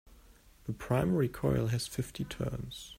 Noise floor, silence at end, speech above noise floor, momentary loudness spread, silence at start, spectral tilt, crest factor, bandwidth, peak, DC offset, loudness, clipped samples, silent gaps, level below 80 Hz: -59 dBFS; 0.05 s; 26 dB; 12 LU; 0.1 s; -6.5 dB/octave; 18 dB; 16 kHz; -16 dBFS; under 0.1%; -33 LUFS; under 0.1%; none; -50 dBFS